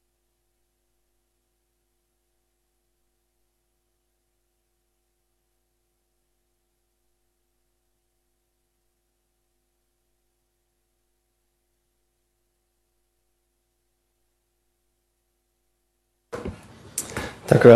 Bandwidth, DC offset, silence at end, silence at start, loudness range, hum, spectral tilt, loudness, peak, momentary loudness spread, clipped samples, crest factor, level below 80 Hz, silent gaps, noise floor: 13 kHz; under 0.1%; 0 s; 16.35 s; 18 LU; none; -6.5 dB/octave; -23 LUFS; 0 dBFS; 19 LU; under 0.1%; 28 dB; -58 dBFS; none; -74 dBFS